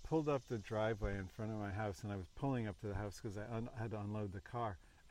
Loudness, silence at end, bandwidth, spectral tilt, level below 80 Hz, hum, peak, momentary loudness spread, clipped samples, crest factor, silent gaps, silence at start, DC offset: -43 LUFS; 0 s; 13.5 kHz; -7 dB/octave; -56 dBFS; none; -26 dBFS; 7 LU; under 0.1%; 16 dB; none; 0 s; under 0.1%